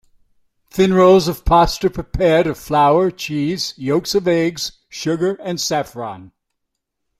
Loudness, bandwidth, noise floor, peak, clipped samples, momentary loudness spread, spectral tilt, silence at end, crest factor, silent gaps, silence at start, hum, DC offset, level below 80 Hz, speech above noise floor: -17 LUFS; 15.5 kHz; -76 dBFS; -2 dBFS; under 0.1%; 14 LU; -5 dB/octave; 0.9 s; 16 dB; none; 0.75 s; none; under 0.1%; -36 dBFS; 60 dB